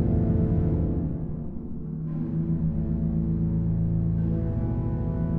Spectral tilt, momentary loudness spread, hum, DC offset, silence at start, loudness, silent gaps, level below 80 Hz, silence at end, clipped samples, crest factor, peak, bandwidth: -13.5 dB/octave; 9 LU; none; under 0.1%; 0 s; -27 LUFS; none; -34 dBFS; 0 s; under 0.1%; 12 dB; -12 dBFS; 2.4 kHz